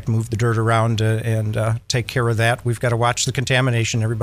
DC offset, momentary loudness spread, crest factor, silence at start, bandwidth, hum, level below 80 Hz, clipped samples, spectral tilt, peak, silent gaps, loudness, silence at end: under 0.1%; 4 LU; 14 dB; 0 s; 15 kHz; none; -46 dBFS; under 0.1%; -5 dB/octave; -4 dBFS; none; -19 LUFS; 0 s